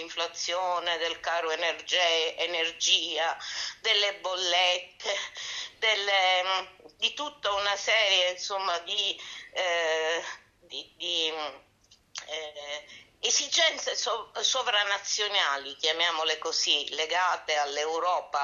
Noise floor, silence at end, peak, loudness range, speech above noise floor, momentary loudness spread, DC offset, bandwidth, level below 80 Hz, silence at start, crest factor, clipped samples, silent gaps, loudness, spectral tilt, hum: -62 dBFS; 0 s; -8 dBFS; 5 LU; 34 dB; 13 LU; under 0.1%; 8.8 kHz; -72 dBFS; 0 s; 20 dB; under 0.1%; none; -27 LUFS; 1.5 dB/octave; none